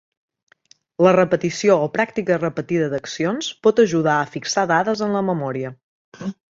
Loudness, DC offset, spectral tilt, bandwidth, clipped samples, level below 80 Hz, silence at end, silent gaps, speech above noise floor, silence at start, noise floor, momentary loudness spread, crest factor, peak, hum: -19 LUFS; under 0.1%; -5 dB/octave; 7.8 kHz; under 0.1%; -62 dBFS; 0.25 s; 5.83-6.12 s; 37 dB; 1 s; -56 dBFS; 12 LU; 18 dB; -2 dBFS; none